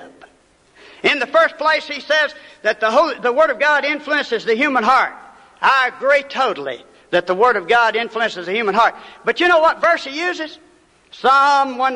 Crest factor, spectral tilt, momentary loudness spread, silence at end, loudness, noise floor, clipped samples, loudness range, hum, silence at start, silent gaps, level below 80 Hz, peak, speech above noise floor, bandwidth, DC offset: 16 dB; -3 dB/octave; 9 LU; 0 s; -16 LUFS; -54 dBFS; under 0.1%; 2 LU; none; 0 s; none; -60 dBFS; -2 dBFS; 37 dB; 11 kHz; under 0.1%